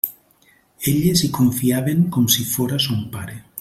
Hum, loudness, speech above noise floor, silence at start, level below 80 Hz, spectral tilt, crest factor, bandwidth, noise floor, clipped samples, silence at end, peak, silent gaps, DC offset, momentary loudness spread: none; -19 LUFS; 38 dB; 0.05 s; -50 dBFS; -4.5 dB/octave; 18 dB; 16.5 kHz; -56 dBFS; under 0.1%; 0 s; -2 dBFS; none; under 0.1%; 10 LU